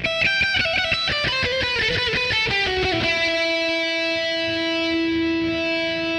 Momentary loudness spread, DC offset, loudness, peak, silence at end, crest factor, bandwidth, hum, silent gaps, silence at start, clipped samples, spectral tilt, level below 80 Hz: 4 LU; under 0.1%; -20 LUFS; -8 dBFS; 0 s; 14 dB; 11 kHz; none; none; 0 s; under 0.1%; -4 dB/octave; -44 dBFS